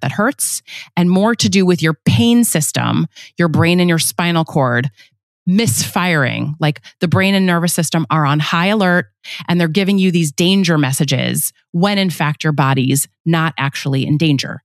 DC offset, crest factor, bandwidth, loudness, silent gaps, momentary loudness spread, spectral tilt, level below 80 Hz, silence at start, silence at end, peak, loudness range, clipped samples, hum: under 0.1%; 14 dB; 14.5 kHz; -15 LUFS; 5.23-5.46 s, 11.69-11.73 s, 13.20-13.25 s; 6 LU; -4.5 dB/octave; -60 dBFS; 0 s; 0.05 s; -2 dBFS; 2 LU; under 0.1%; none